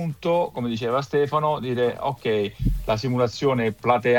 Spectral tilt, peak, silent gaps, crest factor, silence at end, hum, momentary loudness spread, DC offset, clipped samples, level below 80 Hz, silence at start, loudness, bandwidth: -6.5 dB/octave; -6 dBFS; none; 18 dB; 0 s; none; 5 LU; under 0.1%; under 0.1%; -36 dBFS; 0 s; -24 LUFS; 18.5 kHz